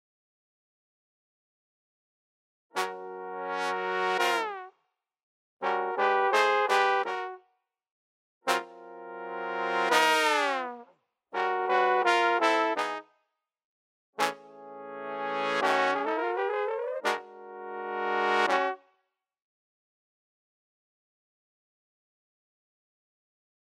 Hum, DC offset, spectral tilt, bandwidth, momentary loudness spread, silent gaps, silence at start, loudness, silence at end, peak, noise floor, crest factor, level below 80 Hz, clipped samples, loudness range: none; under 0.1%; -2 dB/octave; 16 kHz; 17 LU; 5.23-5.57 s, 7.91-8.41 s, 13.65-14.13 s; 2.75 s; -28 LUFS; 4.85 s; -6 dBFS; -79 dBFS; 26 dB; under -90 dBFS; under 0.1%; 6 LU